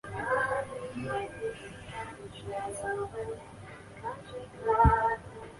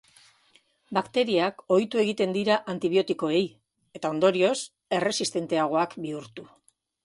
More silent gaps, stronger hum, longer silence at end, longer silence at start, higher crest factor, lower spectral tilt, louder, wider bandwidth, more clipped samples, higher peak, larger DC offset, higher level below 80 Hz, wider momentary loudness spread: neither; neither; second, 0 s vs 0.6 s; second, 0.05 s vs 0.9 s; about the same, 22 dB vs 18 dB; first, -6 dB/octave vs -4.5 dB/octave; second, -32 LUFS vs -26 LUFS; about the same, 11.5 kHz vs 11.5 kHz; neither; about the same, -10 dBFS vs -8 dBFS; neither; first, -42 dBFS vs -72 dBFS; first, 19 LU vs 10 LU